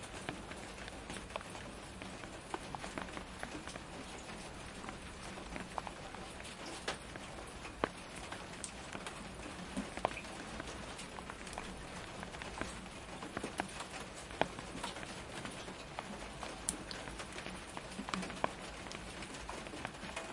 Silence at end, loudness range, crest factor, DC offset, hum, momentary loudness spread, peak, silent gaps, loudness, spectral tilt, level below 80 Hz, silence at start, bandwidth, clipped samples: 0 s; 3 LU; 32 dB; under 0.1%; none; 7 LU; -12 dBFS; none; -45 LUFS; -3.5 dB/octave; -58 dBFS; 0 s; 11.5 kHz; under 0.1%